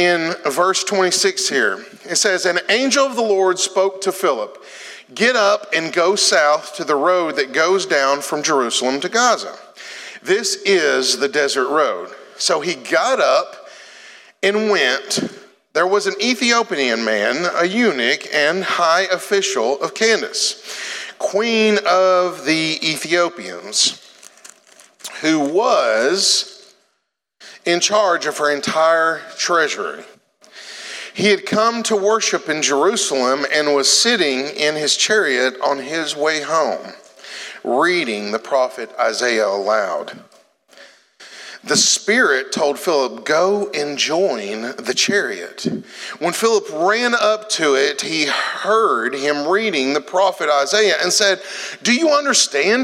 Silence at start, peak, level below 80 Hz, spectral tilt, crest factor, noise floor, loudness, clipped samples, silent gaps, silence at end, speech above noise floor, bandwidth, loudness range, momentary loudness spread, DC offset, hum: 0 s; 0 dBFS; -78 dBFS; -1.5 dB/octave; 18 dB; -72 dBFS; -17 LUFS; under 0.1%; none; 0 s; 54 dB; 16 kHz; 3 LU; 11 LU; under 0.1%; none